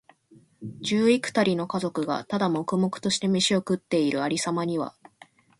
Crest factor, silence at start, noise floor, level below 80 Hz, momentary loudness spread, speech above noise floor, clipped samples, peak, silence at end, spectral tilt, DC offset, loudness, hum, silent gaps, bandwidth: 18 dB; 0.6 s; -57 dBFS; -66 dBFS; 8 LU; 32 dB; under 0.1%; -8 dBFS; 0.7 s; -4.5 dB/octave; under 0.1%; -25 LUFS; none; none; 11.5 kHz